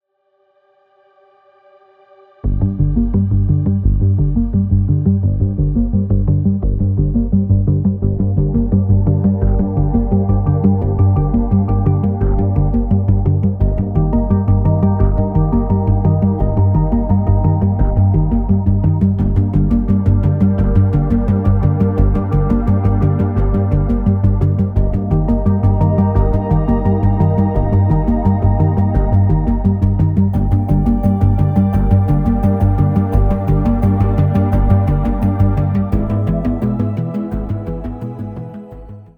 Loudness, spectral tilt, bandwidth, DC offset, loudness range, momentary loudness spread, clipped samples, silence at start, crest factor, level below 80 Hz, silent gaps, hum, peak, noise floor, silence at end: -15 LUFS; -12 dB/octave; 2.9 kHz; under 0.1%; 2 LU; 3 LU; under 0.1%; 2.45 s; 14 dB; -20 dBFS; none; none; 0 dBFS; -61 dBFS; 0.1 s